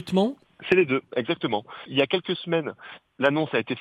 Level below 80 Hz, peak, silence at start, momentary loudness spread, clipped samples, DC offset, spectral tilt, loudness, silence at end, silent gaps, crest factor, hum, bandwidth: -66 dBFS; -6 dBFS; 0 s; 12 LU; under 0.1%; under 0.1%; -6.5 dB/octave; -25 LUFS; 0 s; none; 18 dB; none; 11.5 kHz